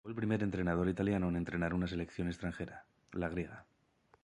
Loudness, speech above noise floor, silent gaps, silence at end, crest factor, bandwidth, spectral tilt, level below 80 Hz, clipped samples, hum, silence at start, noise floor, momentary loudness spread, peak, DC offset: -37 LUFS; 35 dB; none; 0.6 s; 16 dB; 10.5 kHz; -8 dB/octave; -54 dBFS; under 0.1%; none; 0.05 s; -71 dBFS; 13 LU; -20 dBFS; under 0.1%